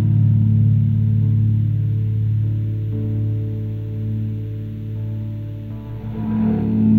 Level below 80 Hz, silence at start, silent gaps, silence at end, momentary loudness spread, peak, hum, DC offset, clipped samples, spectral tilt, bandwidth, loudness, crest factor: -38 dBFS; 0 s; none; 0 s; 12 LU; -4 dBFS; none; under 0.1%; under 0.1%; -12 dB/octave; 2.9 kHz; -20 LUFS; 14 dB